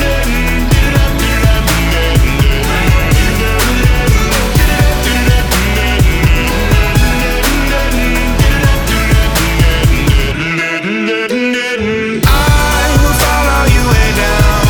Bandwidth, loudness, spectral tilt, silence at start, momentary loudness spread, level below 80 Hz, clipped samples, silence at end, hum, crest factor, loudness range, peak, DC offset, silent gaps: over 20 kHz; -11 LUFS; -4.5 dB/octave; 0 s; 3 LU; -14 dBFS; under 0.1%; 0 s; none; 10 dB; 1 LU; 0 dBFS; under 0.1%; none